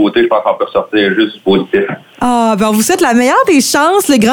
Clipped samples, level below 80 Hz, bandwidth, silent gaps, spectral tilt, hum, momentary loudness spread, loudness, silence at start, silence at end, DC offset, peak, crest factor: under 0.1%; -48 dBFS; 19.5 kHz; none; -4 dB/octave; none; 6 LU; -11 LUFS; 0 s; 0 s; under 0.1%; 0 dBFS; 10 dB